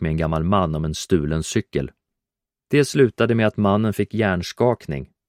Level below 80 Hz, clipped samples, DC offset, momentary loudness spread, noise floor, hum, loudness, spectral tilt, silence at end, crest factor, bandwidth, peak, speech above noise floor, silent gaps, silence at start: -40 dBFS; under 0.1%; under 0.1%; 9 LU; -87 dBFS; none; -21 LUFS; -6 dB/octave; 0.25 s; 18 dB; 15.5 kHz; -2 dBFS; 67 dB; none; 0 s